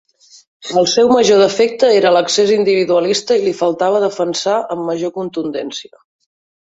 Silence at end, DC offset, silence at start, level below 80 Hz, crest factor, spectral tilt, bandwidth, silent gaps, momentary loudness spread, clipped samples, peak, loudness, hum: 0.85 s; under 0.1%; 0.6 s; -60 dBFS; 14 dB; -3.5 dB/octave; 8 kHz; none; 11 LU; under 0.1%; 0 dBFS; -14 LUFS; none